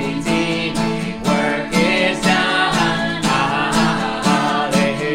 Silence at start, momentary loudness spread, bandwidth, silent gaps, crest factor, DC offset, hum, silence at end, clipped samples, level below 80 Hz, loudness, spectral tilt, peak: 0 s; 4 LU; 16.5 kHz; none; 14 dB; under 0.1%; none; 0 s; under 0.1%; -40 dBFS; -17 LUFS; -4.5 dB/octave; -4 dBFS